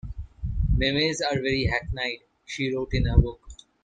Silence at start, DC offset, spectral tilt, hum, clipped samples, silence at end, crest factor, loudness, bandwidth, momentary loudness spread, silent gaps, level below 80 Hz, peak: 0.05 s; under 0.1%; -5.5 dB/octave; none; under 0.1%; 0.3 s; 22 dB; -26 LUFS; 9.2 kHz; 15 LU; none; -30 dBFS; -4 dBFS